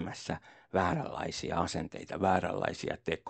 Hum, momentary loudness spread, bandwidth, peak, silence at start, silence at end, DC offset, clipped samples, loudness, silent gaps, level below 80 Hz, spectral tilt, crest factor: none; 10 LU; 9 kHz; -12 dBFS; 0 s; 0 s; under 0.1%; under 0.1%; -34 LUFS; none; -58 dBFS; -5 dB/octave; 22 dB